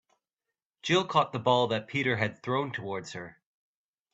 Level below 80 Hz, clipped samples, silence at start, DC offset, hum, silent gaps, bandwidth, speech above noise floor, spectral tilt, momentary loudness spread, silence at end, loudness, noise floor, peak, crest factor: -68 dBFS; under 0.1%; 0.85 s; under 0.1%; none; none; 8.2 kHz; 61 dB; -5 dB/octave; 14 LU; 0.8 s; -29 LUFS; -90 dBFS; -10 dBFS; 20 dB